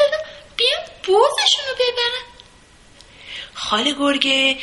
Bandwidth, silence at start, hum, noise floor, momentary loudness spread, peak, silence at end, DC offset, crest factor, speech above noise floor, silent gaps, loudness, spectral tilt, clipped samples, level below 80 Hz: 11.5 kHz; 0 s; none; -48 dBFS; 15 LU; 0 dBFS; 0 s; under 0.1%; 20 dB; 29 dB; none; -18 LUFS; -1 dB/octave; under 0.1%; -54 dBFS